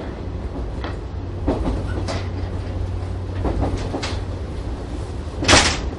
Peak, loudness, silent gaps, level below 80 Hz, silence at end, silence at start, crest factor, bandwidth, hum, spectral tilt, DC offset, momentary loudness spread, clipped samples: 0 dBFS; -23 LUFS; none; -28 dBFS; 0 s; 0 s; 22 dB; 11.5 kHz; none; -4 dB/octave; under 0.1%; 15 LU; under 0.1%